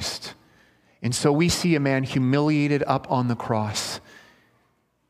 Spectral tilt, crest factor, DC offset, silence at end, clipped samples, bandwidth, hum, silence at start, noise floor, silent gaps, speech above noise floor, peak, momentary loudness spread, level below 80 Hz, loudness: -5 dB/octave; 20 dB; under 0.1%; 1.1 s; under 0.1%; 15.5 kHz; none; 0 s; -67 dBFS; none; 45 dB; -4 dBFS; 11 LU; -54 dBFS; -23 LUFS